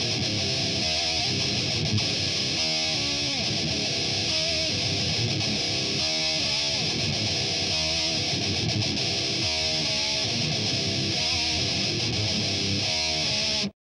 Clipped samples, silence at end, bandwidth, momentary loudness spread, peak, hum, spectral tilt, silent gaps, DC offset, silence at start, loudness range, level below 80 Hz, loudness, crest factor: under 0.1%; 0.15 s; 12.5 kHz; 1 LU; -12 dBFS; none; -2.5 dB/octave; none; under 0.1%; 0 s; 0 LU; -48 dBFS; -24 LUFS; 14 dB